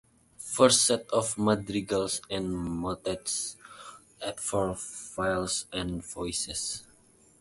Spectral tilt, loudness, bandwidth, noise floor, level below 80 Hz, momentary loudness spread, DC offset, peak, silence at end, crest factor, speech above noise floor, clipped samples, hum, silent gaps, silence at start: -3 dB/octave; -29 LUFS; 12 kHz; -60 dBFS; -54 dBFS; 15 LU; under 0.1%; -8 dBFS; 0.6 s; 22 dB; 31 dB; under 0.1%; none; none; 0.4 s